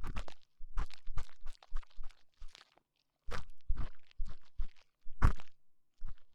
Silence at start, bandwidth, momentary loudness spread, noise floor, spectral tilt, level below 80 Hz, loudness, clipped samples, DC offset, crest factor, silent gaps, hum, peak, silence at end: 0 s; 6.4 kHz; 25 LU; -80 dBFS; -6 dB/octave; -40 dBFS; -44 LUFS; under 0.1%; under 0.1%; 18 dB; none; none; -14 dBFS; 0 s